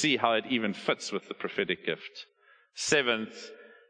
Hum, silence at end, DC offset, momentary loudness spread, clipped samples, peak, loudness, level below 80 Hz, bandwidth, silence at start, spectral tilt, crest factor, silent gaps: none; 0.2 s; under 0.1%; 20 LU; under 0.1%; -8 dBFS; -29 LUFS; -72 dBFS; 10.5 kHz; 0 s; -3 dB/octave; 22 dB; none